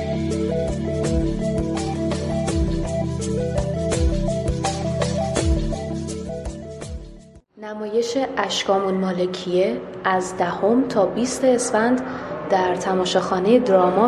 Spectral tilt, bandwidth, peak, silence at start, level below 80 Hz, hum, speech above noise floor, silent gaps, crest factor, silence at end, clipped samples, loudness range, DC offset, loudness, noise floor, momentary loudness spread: -5.5 dB/octave; 12.5 kHz; -4 dBFS; 0 s; -32 dBFS; none; 25 dB; none; 18 dB; 0 s; under 0.1%; 6 LU; under 0.1%; -22 LUFS; -44 dBFS; 10 LU